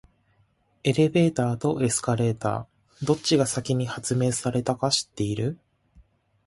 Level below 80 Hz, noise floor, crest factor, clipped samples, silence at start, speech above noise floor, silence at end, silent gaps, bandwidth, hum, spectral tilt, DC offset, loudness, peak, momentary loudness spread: -56 dBFS; -66 dBFS; 18 dB; under 0.1%; 0.85 s; 42 dB; 0.45 s; none; 11.5 kHz; none; -5 dB/octave; under 0.1%; -25 LUFS; -8 dBFS; 8 LU